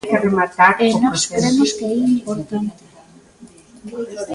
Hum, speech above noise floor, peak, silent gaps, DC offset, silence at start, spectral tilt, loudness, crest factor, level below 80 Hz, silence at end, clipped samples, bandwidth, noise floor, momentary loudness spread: none; 29 dB; 0 dBFS; none; under 0.1%; 0.05 s; -4 dB/octave; -17 LUFS; 18 dB; -54 dBFS; 0 s; under 0.1%; 11.5 kHz; -46 dBFS; 15 LU